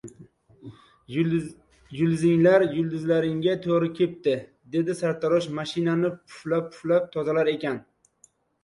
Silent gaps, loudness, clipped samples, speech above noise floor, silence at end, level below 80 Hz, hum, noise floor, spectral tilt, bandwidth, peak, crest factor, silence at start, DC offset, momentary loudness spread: none; -25 LUFS; under 0.1%; 38 dB; 0.85 s; -64 dBFS; none; -61 dBFS; -7 dB/octave; 11.5 kHz; -8 dBFS; 18 dB; 0.05 s; under 0.1%; 10 LU